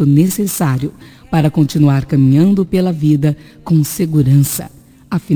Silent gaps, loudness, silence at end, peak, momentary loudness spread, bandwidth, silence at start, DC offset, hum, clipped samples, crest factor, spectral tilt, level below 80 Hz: none; -14 LUFS; 0 s; 0 dBFS; 11 LU; 19 kHz; 0 s; under 0.1%; none; under 0.1%; 12 dB; -7 dB/octave; -42 dBFS